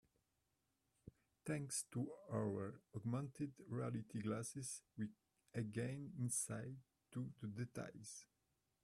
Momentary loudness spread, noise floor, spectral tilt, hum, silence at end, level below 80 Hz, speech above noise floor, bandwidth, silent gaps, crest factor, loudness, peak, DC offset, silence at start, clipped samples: 12 LU; -87 dBFS; -5.5 dB/octave; none; 0.6 s; -80 dBFS; 40 dB; 13.5 kHz; none; 20 dB; -47 LUFS; -28 dBFS; under 0.1%; 1.05 s; under 0.1%